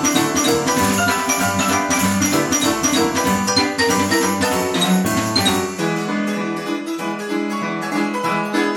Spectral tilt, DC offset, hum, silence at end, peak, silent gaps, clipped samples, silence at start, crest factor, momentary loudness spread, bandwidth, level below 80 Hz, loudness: -3 dB/octave; under 0.1%; none; 0 s; -2 dBFS; none; under 0.1%; 0 s; 16 dB; 7 LU; 18 kHz; -52 dBFS; -18 LUFS